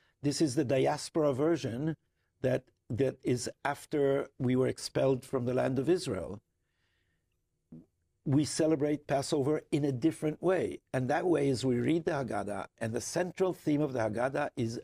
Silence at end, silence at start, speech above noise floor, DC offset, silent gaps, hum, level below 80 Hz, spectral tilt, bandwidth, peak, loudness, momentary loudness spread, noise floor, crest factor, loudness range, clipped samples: 0 s; 0.25 s; 49 dB; under 0.1%; none; none; -64 dBFS; -6 dB/octave; 15.5 kHz; -16 dBFS; -32 LUFS; 7 LU; -80 dBFS; 16 dB; 4 LU; under 0.1%